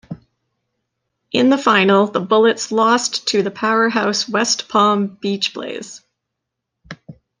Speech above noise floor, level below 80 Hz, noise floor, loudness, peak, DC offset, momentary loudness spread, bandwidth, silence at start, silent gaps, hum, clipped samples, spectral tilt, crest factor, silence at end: 63 dB; -62 dBFS; -79 dBFS; -16 LUFS; -2 dBFS; under 0.1%; 17 LU; 10 kHz; 0.1 s; none; none; under 0.1%; -3.5 dB/octave; 16 dB; 0.3 s